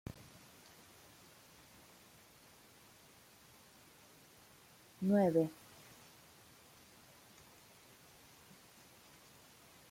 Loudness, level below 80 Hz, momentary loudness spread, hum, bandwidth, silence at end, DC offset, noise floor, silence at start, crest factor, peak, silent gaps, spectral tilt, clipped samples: -35 LUFS; -76 dBFS; 25 LU; none; 16.5 kHz; 4.4 s; under 0.1%; -63 dBFS; 5 s; 24 dB; -20 dBFS; none; -7 dB/octave; under 0.1%